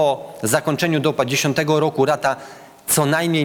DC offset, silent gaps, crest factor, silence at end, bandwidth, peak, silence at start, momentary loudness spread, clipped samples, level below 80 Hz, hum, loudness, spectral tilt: under 0.1%; none; 16 dB; 0 s; 19.5 kHz; -2 dBFS; 0 s; 6 LU; under 0.1%; -58 dBFS; none; -19 LUFS; -4 dB/octave